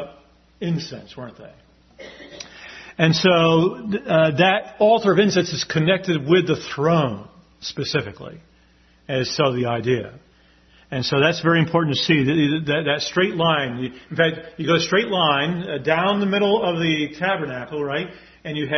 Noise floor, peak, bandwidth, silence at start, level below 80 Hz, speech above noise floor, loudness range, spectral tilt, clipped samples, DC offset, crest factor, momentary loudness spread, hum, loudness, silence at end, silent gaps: -55 dBFS; -2 dBFS; 6.4 kHz; 0 s; -56 dBFS; 35 dB; 7 LU; -5.5 dB/octave; under 0.1%; under 0.1%; 20 dB; 19 LU; none; -20 LUFS; 0 s; none